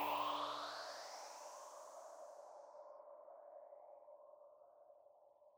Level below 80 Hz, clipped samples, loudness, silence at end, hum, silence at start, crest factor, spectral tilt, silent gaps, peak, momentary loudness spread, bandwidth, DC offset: under -90 dBFS; under 0.1%; -50 LUFS; 0 s; none; 0 s; 20 dB; -1.5 dB/octave; none; -30 dBFS; 23 LU; over 20 kHz; under 0.1%